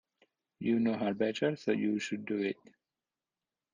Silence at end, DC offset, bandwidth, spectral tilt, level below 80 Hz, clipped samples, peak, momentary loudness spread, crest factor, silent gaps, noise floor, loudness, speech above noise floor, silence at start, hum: 1.2 s; under 0.1%; 9.6 kHz; -6 dB/octave; -78 dBFS; under 0.1%; -18 dBFS; 7 LU; 16 dB; none; under -90 dBFS; -33 LUFS; over 58 dB; 0.6 s; none